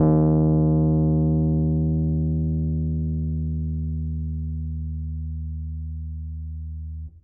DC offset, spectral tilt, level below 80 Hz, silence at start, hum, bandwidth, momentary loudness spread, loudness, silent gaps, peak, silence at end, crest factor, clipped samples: under 0.1%; -16.5 dB/octave; -34 dBFS; 0 s; none; 1.6 kHz; 15 LU; -24 LUFS; none; -10 dBFS; 0.05 s; 14 dB; under 0.1%